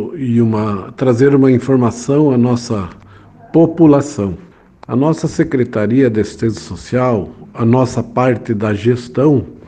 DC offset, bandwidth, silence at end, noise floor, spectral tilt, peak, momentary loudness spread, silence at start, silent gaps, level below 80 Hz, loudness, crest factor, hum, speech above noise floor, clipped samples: under 0.1%; 9.4 kHz; 0.1 s; -40 dBFS; -8 dB/octave; 0 dBFS; 10 LU; 0 s; none; -46 dBFS; -14 LUFS; 14 dB; none; 27 dB; under 0.1%